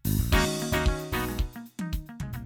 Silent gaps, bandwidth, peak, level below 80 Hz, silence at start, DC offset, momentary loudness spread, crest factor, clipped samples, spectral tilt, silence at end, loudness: none; 19.5 kHz; -12 dBFS; -32 dBFS; 0.05 s; under 0.1%; 11 LU; 16 dB; under 0.1%; -5 dB/octave; 0 s; -29 LUFS